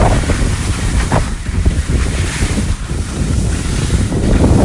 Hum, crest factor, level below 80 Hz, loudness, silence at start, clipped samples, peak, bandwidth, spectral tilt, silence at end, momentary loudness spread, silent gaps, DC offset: none; 14 dB; -18 dBFS; -16 LUFS; 0 s; under 0.1%; 0 dBFS; 11.5 kHz; -5.5 dB/octave; 0 s; 5 LU; none; under 0.1%